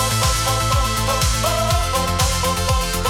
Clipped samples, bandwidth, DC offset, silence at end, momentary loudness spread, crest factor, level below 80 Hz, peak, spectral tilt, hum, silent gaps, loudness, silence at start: under 0.1%; 18 kHz; under 0.1%; 0 s; 2 LU; 14 dB; -26 dBFS; -4 dBFS; -3 dB/octave; none; none; -18 LUFS; 0 s